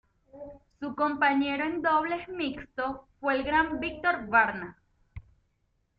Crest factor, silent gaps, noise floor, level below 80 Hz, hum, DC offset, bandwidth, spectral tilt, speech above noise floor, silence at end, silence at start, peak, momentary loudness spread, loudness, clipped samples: 20 dB; none; -74 dBFS; -56 dBFS; none; under 0.1%; 5.2 kHz; -7.5 dB/octave; 46 dB; 0.8 s; 0.35 s; -10 dBFS; 18 LU; -28 LUFS; under 0.1%